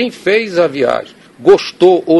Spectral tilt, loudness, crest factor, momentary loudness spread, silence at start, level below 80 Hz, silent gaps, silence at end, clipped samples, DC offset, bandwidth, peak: -5.5 dB/octave; -12 LUFS; 12 dB; 6 LU; 0 s; -52 dBFS; none; 0 s; 0.5%; under 0.1%; 12 kHz; 0 dBFS